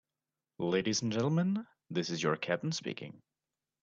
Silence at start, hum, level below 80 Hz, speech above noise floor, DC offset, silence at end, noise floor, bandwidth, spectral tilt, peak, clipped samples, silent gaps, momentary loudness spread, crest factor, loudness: 0.6 s; none; -74 dBFS; over 57 dB; under 0.1%; 0.65 s; under -90 dBFS; 7.6 kHz; -5 dB/octave; -16 dBFS; under 0.1%; none; 9 LU; 20 dB; -34 LUFS